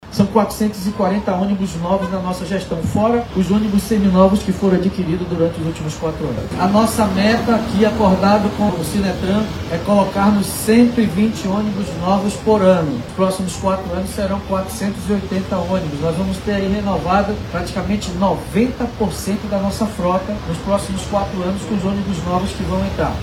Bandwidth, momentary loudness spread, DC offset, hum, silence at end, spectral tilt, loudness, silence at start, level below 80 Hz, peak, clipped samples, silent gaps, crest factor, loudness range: 16 kHz; 8 LU; under 0.1%; none; 0 s; -6.5 dB/octave; -18 LUFS; 0 s; -34 dBFS; 0 dBFS; under 0.1%; none; 16 dB; 4 LU